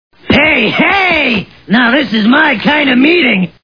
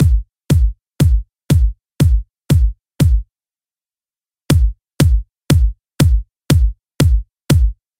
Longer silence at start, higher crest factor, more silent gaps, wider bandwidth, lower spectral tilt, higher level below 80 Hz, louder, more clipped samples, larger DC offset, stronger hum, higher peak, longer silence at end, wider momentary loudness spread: first, 0.25 s vs 0 s; about the same, 10 dB vs 14 dB; neither; second, 5.4 kHz vs 16.5 kHz; about the same, -6.5 dB/octave vs -6.5 dB/octave; second, -40 dBFS vs -18 dBFS; first, -9 LUFS vs -17 LUFS; first, 0.2% vs under 0.1%; first, 0.5% vs under 0.1%; neither; about the same, 0 dBFS vs 0 dBFS; about the same, 0.15 s vs 0.25 s; about the same, 4 LU vs 6 LU